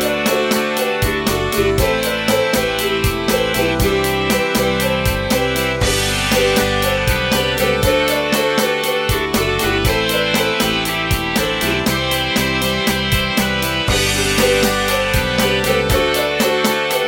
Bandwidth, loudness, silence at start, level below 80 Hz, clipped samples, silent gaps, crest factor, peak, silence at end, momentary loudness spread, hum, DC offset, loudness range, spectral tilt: 17 kHz; -16 LUFS; 0 s; -30 dBFS; under 0.1%; none; 16 dB; -2 dBFS; 0 s; 2 LU; none; under 0.1%; 1 LU; -3.5 dB/octave